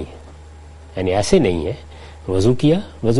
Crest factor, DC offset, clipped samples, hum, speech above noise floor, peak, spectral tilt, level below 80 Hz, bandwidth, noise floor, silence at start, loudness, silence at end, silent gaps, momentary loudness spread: 18 dB; under 0.1%; under 0.1%; none; 23 dB; 0 dBFS; -6.5 dB/octave; -36 dBFS; 11.5 kHz; -39 dBFS; 0 s; -18 LUFS; 0 s; none; 18 LU